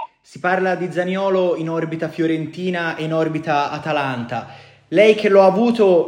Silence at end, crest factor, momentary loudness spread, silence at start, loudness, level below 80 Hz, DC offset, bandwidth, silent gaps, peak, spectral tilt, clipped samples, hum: 0 s; 18 dB; 12 LU; 0 s; -18 LUFS; -66 dBFS; under 0.1%; 10.5 kHz; none; 0 dBFS; -6.5 dB/octave; under 0.1%; none